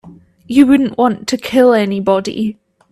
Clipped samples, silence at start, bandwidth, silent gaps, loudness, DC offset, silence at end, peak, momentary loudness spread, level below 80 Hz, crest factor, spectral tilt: under 0.1%; 0.05 s; 14 kHz; none; -13 LUFS; under 0.1%; 0.4 s; 0 dBFS; 10 LU; -50 dBFS; 14 dB; -5.5 dB/octave